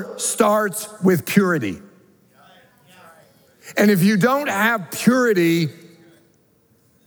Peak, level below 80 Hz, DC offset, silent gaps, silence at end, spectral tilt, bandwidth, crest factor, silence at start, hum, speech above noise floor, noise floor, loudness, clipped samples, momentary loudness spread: -2 dBFS; -70 dBFS; under 0.1%; none; 1.35 s; -5 dB/octave; over 20 kHz; 20 dB; 0 s; none; 41 dB; -59 dBFS; -18 LUFS; under 0.1%; 9 LU